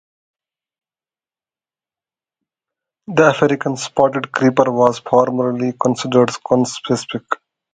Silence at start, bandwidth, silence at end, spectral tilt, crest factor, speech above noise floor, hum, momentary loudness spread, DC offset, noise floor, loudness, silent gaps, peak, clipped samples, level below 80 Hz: 3.1 s; 9.4 kHz; 0.4 s; -5.5 dB/octave; 18 dB; over 74 dB; none; 7 LU; under 0.1%; under -90 dBFS; -17 LUFS; none; 0 dBFS; under 0.1%; -58 dBFS